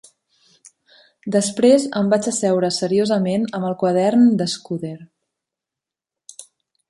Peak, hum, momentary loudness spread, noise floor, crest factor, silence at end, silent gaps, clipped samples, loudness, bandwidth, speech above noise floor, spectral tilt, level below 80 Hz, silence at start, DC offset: -2 dBFS; none; 17 LU; -87 dBFS; 18 dB; 0.5 s; none; under 0.1%; -18 LUFS; 11.5 kHz; 69 dB; -5 dB/octave; -66 dBFS; 1.25 s; under 0.1%